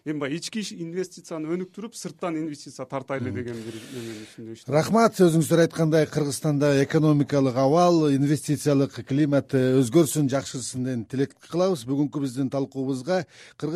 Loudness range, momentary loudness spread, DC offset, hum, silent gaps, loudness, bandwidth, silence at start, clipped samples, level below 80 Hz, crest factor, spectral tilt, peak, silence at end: 11 LU; 16 LU; under 0.1%; none; none; -24 LUFS; 15 kHz; 0.05 s; under 0.1%; -64 dBFS; 16 dB; -6 dB/octave; -8 dBFS; 0 s